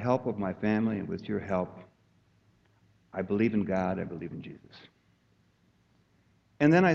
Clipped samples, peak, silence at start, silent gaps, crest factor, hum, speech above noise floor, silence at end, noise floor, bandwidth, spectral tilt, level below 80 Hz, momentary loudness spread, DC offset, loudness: under 0.1%; -10 dBFS; 0 s; none; 20 dB; none; 39 dB; 0 s; -68 dBFS; 7.4 kHz; -8 dB/octave; -64 dBFS; 15 LU; under 0.1%; -30 LUFS